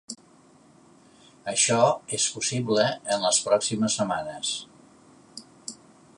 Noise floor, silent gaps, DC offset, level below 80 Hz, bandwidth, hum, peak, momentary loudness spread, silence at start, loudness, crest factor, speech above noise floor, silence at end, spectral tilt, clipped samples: -56 dBFS; none; under 0.1%; -68 dBFS; 11.5 kHz; none; -6 dBFS; 20 LU; 0.1 s; -24 LUFS; 20 dB; 31 dB; 0.45 s; -3 dB/octave; under 0.1%